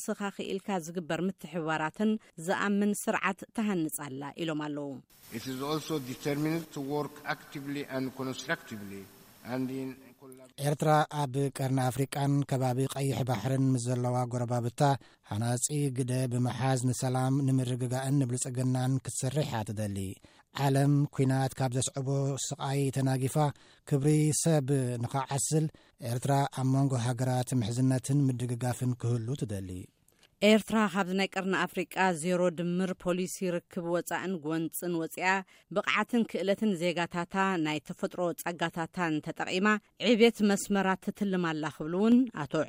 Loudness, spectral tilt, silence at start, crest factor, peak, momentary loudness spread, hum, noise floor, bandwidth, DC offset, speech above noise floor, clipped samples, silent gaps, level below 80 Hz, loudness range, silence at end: -30 LUFS; -5.5 dB/octave; 0 s; 20 dB; -10 dBFS; 10 LU; none; -61 dBFS; 16 kHz; under 0.1%; 31 dB; under 0.1%; none; -66 dBFS; 6 LU; 0 s